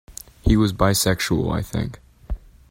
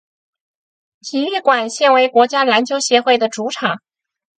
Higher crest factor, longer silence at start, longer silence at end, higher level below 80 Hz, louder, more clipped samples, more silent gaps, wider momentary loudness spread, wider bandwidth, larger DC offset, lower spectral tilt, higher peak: about the same, 20 dB vs 16 dB; second, 0.1 s vs 1.05 s; second, 0.35 s vs 0.6 s; first, -32 dBFS vs -72 dBFS; second, -21 LUFS vs -15 LUFS; neither; neither; first, 18 LU vs 9 LU; first, 16.5 kHz vs 9.4 kHz; neither; first, -5 dB/octave vs -2.5 dB/octave; about the same, -2 dBFS vs 0 dBFS